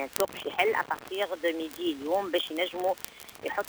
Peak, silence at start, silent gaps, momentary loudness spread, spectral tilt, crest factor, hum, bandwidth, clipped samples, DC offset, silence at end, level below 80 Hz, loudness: 0 dBFS; 0 s; none; 7 LU; -2.5 dB/octave; 30 dB; none; over 20 kHz; under 0.1%; under 0.1%; 0 s; -66 dBFS; -30 LUFS